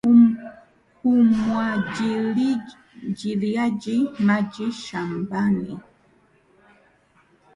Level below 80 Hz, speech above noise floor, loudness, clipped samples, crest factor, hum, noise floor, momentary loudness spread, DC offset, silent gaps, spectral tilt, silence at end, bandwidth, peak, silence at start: -60 dBFS; 37 dB; -22 LUFS; under 0.1%; 16 dB; none; -59 dBFS; 15 LU; under 0.1%; none; -7 dB/octave; 1.75 s; 9.8 kHz; -6 dBFS; 0.05 s